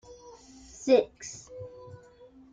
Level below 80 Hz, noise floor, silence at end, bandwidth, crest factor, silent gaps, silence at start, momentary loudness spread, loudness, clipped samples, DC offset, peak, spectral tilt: -64 dBFS; -54 dBFS; 0.85 s; 9 kHz; 22 dB; none; 0.8 s; 26 LU; -26 LUFS; under 0.1%; under 0.1%; -10 dBFS; -4 dB/octave